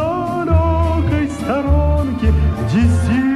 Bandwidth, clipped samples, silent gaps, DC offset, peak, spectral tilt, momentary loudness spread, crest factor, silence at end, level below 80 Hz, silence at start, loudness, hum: 11.5 kHz; under 0.1%; none; under 0.1%; -2 dBFS; -8 dB/octave; 4 LU; 12 dB; 0 s; -20 dBFS; 0 s; -16 LUFS; none